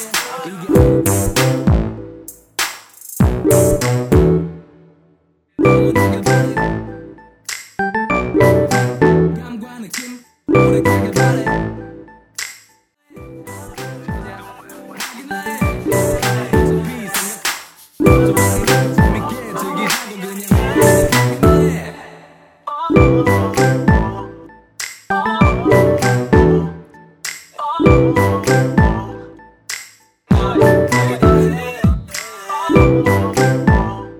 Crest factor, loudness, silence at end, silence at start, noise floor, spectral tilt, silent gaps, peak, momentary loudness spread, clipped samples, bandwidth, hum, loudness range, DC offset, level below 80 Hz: 16 dB; -15 LUFS; 0 s; 0 s; -57 dBFS; -6 dB/octave; none; 0 dBFS; 17 LU; under 0.1%; 19 kHz; none; 5 LU; under 0.1%; -28 dBFS